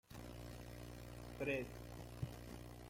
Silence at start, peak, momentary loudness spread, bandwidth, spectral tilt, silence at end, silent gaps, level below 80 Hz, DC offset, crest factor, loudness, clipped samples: 0.1 s; -30 dBFS; 11 LU; 16.5 kHz; -6 dB/octave; 0 s; none; -60 dBFS; under 0.1%; 20 dB; -49 LUFS; under 0.1%